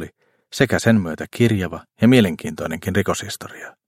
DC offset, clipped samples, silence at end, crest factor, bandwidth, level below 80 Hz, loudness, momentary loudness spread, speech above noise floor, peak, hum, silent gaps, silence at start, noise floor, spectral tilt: under 0.1%; under 0.1%; 0.2 s; 20 dB; 16.5 kHz; -50 dBFS; -19 LUFS; 16 LU; 19 dB; 0 dBFS; none; none; 0 s; -38 dBFS; -6 dB/octave